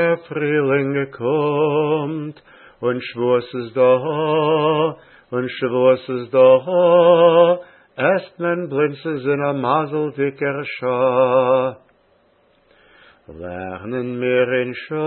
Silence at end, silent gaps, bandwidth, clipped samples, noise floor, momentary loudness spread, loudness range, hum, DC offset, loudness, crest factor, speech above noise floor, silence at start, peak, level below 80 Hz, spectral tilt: 0 s; none; 4.4 kHz; under 0.1%; -58 dBFS; 13 LU; 6 LU; none; under 0.1%; -18 LUFS; 18 dB; 40 dB; 0 s; -2 dBFS; -64 dBFS; -11.5 dB/octave